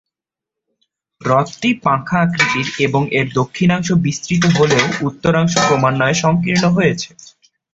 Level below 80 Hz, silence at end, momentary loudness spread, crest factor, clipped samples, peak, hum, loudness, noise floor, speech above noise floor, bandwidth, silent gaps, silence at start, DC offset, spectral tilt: -48 dBFS; 0.7 s; 5 LU; 16 dB; under 0.1%; 0 dBFS; none; -15 LUFS; -85 dBFS; 70 dB; 8 kHz; none; 1.2 s; under 0.1%; -5 dB/octave